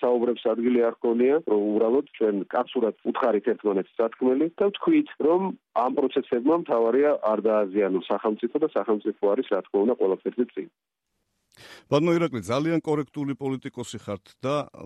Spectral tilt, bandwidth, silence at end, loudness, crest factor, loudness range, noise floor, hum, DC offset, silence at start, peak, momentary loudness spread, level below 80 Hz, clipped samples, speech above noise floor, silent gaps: -7 dB/octave; 11.5 kHz; 0 s; -25 LUFS; 16 dB; 4 LU; -76 dBFS; none; under 0.1%; 0 s; -8 dBFS; 8 LU; -70 dBFS; under 0.1%; 52 dB; none